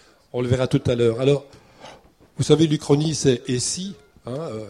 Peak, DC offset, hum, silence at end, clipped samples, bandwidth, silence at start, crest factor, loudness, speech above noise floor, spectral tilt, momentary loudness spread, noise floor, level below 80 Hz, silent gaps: -2 dBFS; under 0.1%; none; 0 s; under 0.1%; 12 kHz; 0.35 s; 20 dB; -21 LUFS; 28 dB; -5.5 dB/octave; 15 LU; -48 dBFS; -50 dBFS; none